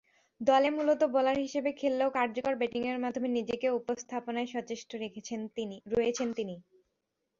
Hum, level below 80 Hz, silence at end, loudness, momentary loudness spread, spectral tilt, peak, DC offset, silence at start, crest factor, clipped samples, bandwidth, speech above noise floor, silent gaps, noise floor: none; -68 dBFS; 0.8 s; -31 LUFS; 12 LU; -4.5 dB/octave; -14 dBFS; under 0.1%; 0.4 s; 18 dB; under 0.1%; 7.6 kHz; 52 dB; none; -83 dBFS